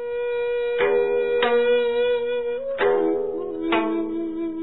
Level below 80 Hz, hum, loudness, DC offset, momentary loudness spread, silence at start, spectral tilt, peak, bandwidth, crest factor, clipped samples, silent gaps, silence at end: -54 dBFS; none; -22 LUFS; 0.6%; 8 LU; 0 s; -8 dB/octave; -10 dBFS; 4.1 kHz; 14 dB; under 0.1%; none; 0 s